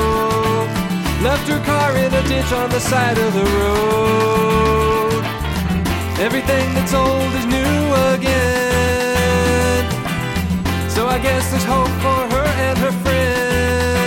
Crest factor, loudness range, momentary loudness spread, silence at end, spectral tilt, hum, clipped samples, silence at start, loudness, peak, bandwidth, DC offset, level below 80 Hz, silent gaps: 12 dB; 2 LU; 4 LU; 0 s; -5 dB/octave; none; under 0.1%; 0 s; -17 LUFS; -4 dBFS; 17.5 kHz; under 0.1%; -28 dBFS; none